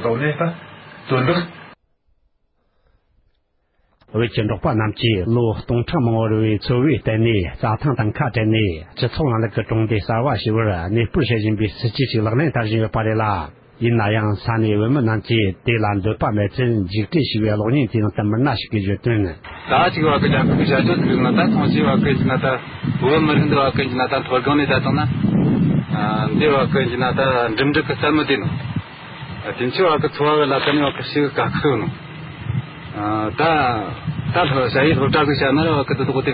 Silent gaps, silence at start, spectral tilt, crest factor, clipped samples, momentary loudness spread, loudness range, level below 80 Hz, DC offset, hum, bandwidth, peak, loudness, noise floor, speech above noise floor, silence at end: none; 0 s; -12 dB/octave; 16 dB; under 0.1%; 8 LU; 4 LU; -40 dBFS; under 0.1%; none; 5.2 kHz; -2 dBFS; -18 LUFS; -65 dBFS; 47 dB; 0 s